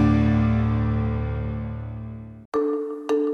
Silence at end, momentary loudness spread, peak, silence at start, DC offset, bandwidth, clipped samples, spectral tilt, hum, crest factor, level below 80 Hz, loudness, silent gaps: 0 s; 15 LU; -8 dBFS; 0 s; under 0.1%; 6.6 kHz; under 0.1%; -9.5 dB/octave; none; 14 dB; -34 dBFS; -24 LUFS; 2.45-2.52 s